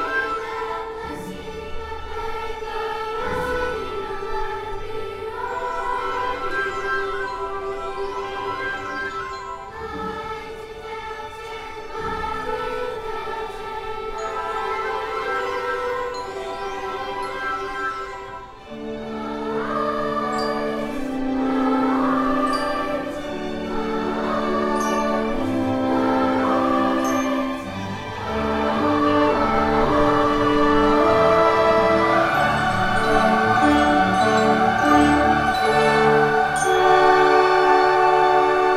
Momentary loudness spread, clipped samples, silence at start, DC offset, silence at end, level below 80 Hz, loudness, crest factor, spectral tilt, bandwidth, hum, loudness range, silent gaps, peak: 15 LU; under 0.1%; 0 s; under 0.1%; 0 s; -40 dBFS; -21 LUFS; 18 dB; -5 dB/octave; 15 kHz; none; 12 LU; none; -4 dBFS